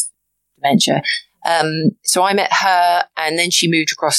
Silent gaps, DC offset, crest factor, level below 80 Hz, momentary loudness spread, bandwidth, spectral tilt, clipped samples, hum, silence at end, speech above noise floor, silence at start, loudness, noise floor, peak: none; under 0.1%; 16 dB; -68 dBFS; 7 LU; 15 kHz; -3 dB/octave; under 0.1%; none; 0 s; 50 dB; 0 s; -15 LUFS; -66 dBFS; 0 dBFS